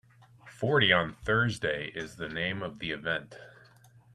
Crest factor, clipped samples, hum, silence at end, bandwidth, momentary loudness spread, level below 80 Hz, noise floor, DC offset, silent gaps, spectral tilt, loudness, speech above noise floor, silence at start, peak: 24 dB; under 0.1%; none; 0.65 s; 12.5 kHz; 14 LU; -58 dBFS; -58 dBFS; under 0.1%; none; -5 dB/octave; -29 LUFS; 28 dB; 0.45 s; -8 dBFS